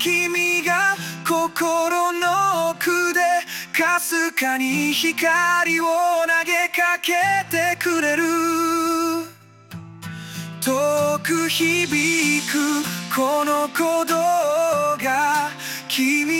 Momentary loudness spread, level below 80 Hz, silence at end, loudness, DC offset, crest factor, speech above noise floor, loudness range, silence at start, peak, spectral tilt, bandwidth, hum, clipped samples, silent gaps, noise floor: 6 LU; -68 dBFS; 0 s; -19 LUFS; under 0.1%; 14 dB; 23 dB; 4 LU; 0 s; -6 dBFS; -2.5 dB/octave; 17 kHz; none; under 0.1%; none; -43 dBFS